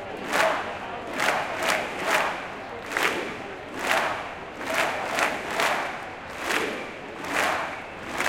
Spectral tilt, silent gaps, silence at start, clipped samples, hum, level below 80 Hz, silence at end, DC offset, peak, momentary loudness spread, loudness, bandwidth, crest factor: -2 dB/octave; none; 0 s; under 0.1%; none; -58 dBFS; 0 s; under 0.1%; -6 dBFS; 11 LU; -27 LUFS; 17 kHz; 22 dB